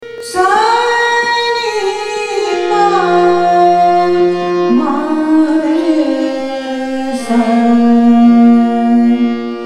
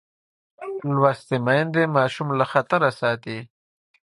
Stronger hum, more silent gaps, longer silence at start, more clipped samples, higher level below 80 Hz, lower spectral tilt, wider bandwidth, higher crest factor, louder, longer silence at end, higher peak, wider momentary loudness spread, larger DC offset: neither; neither; second, 0 s vs 0.6 s; neither; first, -54 dBFS vs -66 dBFS; second, -5 dB/octave vs -7 dB/octave; about the same, 11.5 kHz vs 11.5 kHz; second, 10 dB vs 20 dB; first, -11 LUFS vs -22 LUFS; second, 0 s vs 0.6 s; about the same, 0 dBFS vs -2 dBFS; second, 9 LU vs 14 LU; neither